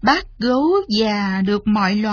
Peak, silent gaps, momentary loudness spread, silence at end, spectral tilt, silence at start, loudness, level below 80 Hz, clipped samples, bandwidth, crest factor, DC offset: -2 dBFS; none; 2 LU; 0 s; -6 dB/octave; 0 s; -18 LUFS; -44 dBFS; under 0.1%; 5.4 kHz; 16 dB; under 0.1%